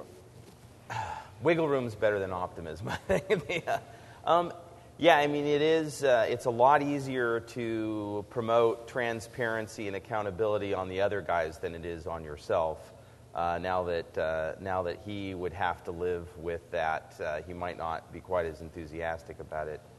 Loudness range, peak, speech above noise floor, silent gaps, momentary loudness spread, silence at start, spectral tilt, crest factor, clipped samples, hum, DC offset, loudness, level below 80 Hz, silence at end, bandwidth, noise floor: 8 LU; -8 dBFS; 22 dB; none; 12 LU; 0 s; -5.5 dB/octave; 24 dB; under 0.1%; none; under 0.1%; -31 LUFS; -58 dBFS; 0 s; 12 kHz; -52 dBFS